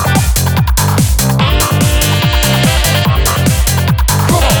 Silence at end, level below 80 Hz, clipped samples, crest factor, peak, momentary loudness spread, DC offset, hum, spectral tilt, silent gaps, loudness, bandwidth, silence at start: 0 s; -16 dBFS; under 0.1%; 10 dB; 0 dBFS; 2 LU; under 0.1%; none; -4 dB/octave; none; -11 LUFS; over 20 kHz; 0 s